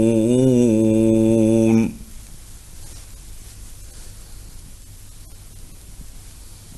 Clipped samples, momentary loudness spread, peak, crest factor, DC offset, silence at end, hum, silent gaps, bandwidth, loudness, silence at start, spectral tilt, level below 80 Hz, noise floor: under 0.1%; 26 LU; -4 dBFS; 16 dB; under 0.1%; 0.05 s; none; none; 12.5 kHz; -16 LUFS; 0 s; -7.5 dB/octave; -40 dBFS; -39 dBFS